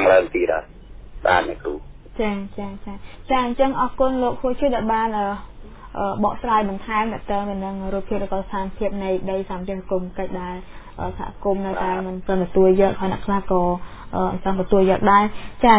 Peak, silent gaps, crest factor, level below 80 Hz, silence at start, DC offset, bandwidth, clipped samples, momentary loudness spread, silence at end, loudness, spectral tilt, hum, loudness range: -2 dBFS; none; 18 dB; -38 dBFS; 0 s; under 0.1%; 4 kHz; under 0.1%; 14 LU; 0 s; -22 LUFS; -10.5 dB/octave; none; 6 LU